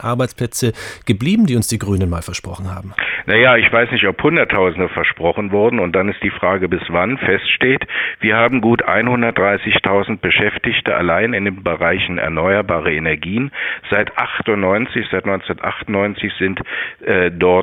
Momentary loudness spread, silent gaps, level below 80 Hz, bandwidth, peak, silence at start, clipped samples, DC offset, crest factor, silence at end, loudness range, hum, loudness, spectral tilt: 7 LU; none; -42 dBFS; 18 kHz; 0 dBFS; 0 s; under 0.1%; under 0.1%; 16 dB; 0 s; 4 LU; none; -16 LUFS; -5 dB/octave